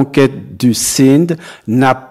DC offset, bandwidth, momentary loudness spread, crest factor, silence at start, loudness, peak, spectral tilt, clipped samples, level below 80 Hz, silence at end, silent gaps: under 0.1%; 15.5 kHz; 8 LU; 12 dB; 0 s; -12 LUFS; 0 dBFS; -5 dB/octave; under 0.1%; -48 dBFS; 0.05 s; none